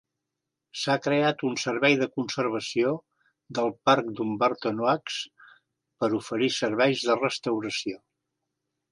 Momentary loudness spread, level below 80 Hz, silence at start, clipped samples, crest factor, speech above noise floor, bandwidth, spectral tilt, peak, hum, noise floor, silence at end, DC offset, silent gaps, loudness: 11 LU; -74 dBFS; 0.75 s; under 0.1%; 22 dB; 59 dB; 11.5 kHz; -4.5 dB/octave; -6 dBFS; none; -85 dBFS; 0.95 s; under 0.1%; none; -26 LUFS